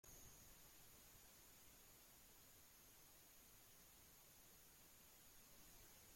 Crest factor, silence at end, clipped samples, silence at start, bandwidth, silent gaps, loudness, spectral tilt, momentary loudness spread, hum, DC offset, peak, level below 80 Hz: 16 dB; 0 s; under 0.1%; 0.05 s; 16.5 kHz; none; -65 LUFS; -2 dB/octave; 2 LU; none; under 0.1%; -52 dBFS; -78 dBFS